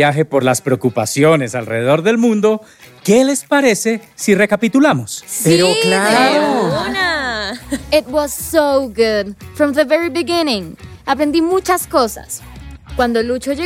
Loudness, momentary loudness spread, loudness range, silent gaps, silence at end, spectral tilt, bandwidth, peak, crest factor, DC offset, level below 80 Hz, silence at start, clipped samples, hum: -15 LUFS; 10 LU; 3 LU; none; 0 s; -4.5 dB/octave; 17 kHz; 0 dBFS; 14 dB; under 0.1%; -42 dBFS; 0 s; under 0.1%; none